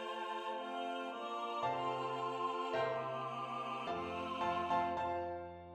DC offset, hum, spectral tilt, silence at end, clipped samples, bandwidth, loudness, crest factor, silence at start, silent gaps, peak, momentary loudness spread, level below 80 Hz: under 0.1%; none; -5.5 dB/octave; 0 s; under 0.1%; 12 kHz; -40 LUFS; 16 dB; 0 s; none; -24 dBFS; 6 LU; -72 dBFS